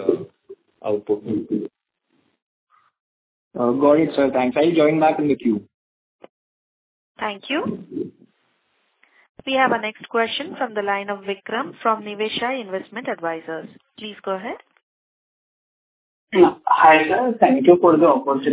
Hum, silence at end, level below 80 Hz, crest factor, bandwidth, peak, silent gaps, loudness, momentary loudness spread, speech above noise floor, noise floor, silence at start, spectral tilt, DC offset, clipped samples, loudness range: none; 0 s; -64 dBFS; 20 dB; 4 kHz; 0 dBFS; 2.42-2.67 s, 3.00-3.51 s, 5.74-6.19 s, 6.29-7.15 s, 9.29-9.35 s, 14.83-16.27 s; -19 LUFS; 18 LU; 49 dB; -68 dBFS; 0 s; -9.5 dB/octave; under 0.1%; under 0.1%; 13 LU